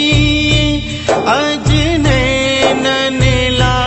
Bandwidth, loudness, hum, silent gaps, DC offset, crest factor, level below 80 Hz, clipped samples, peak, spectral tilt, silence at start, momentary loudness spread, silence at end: 8.4 kHz; -12 LUFS; none; none; under 0.1%; 12 dB; -24 dBFS; under 0.1%; 0 dBFS; -5 dB/octave; 0 s; 3 LU; 0 s